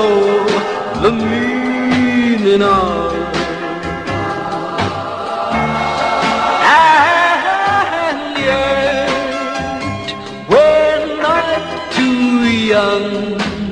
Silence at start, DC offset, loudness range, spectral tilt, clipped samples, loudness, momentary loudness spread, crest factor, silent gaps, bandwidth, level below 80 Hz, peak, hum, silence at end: 0 s; 0.1%; 5 LU; -5 dB/octave; under 0.1%; -14 LUFS; 10 LU; 14 dB; none; 10.5 kHz; -40 dBFS; 0 dBFS; none; 0 s